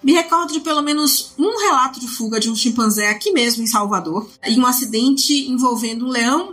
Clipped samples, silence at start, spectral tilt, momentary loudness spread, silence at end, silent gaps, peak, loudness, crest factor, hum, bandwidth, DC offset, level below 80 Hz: under 0.1%; 0.05 s; -2.5 dB/octave; 6 LU; 0 s; none; -2 dBFS; -17 LUFS; 14 dB; none; 16 kHz; under 0.1%; -66 dBFS